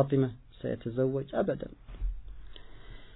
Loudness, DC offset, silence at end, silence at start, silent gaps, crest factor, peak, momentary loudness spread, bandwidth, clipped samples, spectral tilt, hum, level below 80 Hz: -33 LUFS; under 0.1%; 0 s; 0 s; none; 20 dB; -14 dBFS; 22 LU; 4.1 kHz; under 0.1%; -11.5 dB/octave; none; -44 dBFS